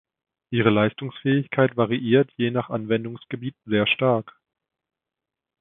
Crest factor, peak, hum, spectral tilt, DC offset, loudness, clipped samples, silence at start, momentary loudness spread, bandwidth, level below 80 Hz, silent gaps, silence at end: 20 dB; -2 dBFS; none; -11 dB/octave; under 0.1%; -23 LUFS; under 0.1%; 0.5 s; 9 LU; 4 kHz; -62 dBFS; none; 1.3 s